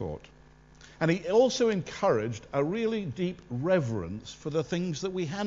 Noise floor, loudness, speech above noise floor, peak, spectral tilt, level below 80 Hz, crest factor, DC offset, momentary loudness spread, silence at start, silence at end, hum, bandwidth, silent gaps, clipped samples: -55 dBFS; -29 LUFS; 27 dB; -12 dBFS; -6 dB/octave; -56 dBFS; 18 dB; under 0.1%; 10 LU; 0 s; 0 s; none; 7.8 kHz; none; under 0.1%